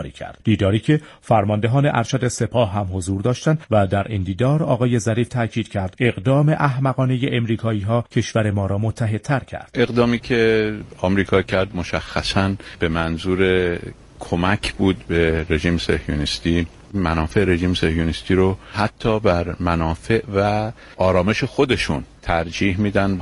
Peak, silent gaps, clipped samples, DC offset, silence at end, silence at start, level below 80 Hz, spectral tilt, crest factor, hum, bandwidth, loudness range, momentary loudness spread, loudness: -2 dBFS; none; under 0.1%; under 0.1%; 0 s; 0 s; -38 dBFS; -6.5 dB/octave; 16 dB; none; 11.5 kHz; 1 LU; 6 LU; -20 LUFS